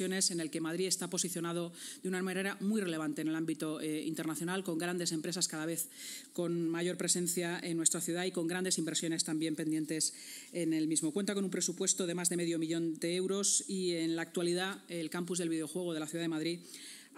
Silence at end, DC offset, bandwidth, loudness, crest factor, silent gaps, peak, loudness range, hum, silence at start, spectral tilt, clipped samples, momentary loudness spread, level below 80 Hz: 0 s; under 0.1%; 16 kHz; -35 LUFS; 24 dB; none; -10 dBFS; 3 LU; none; 0 s; -3.5 dB/octave; under 0.1%; 7 LU; under -90 dBFS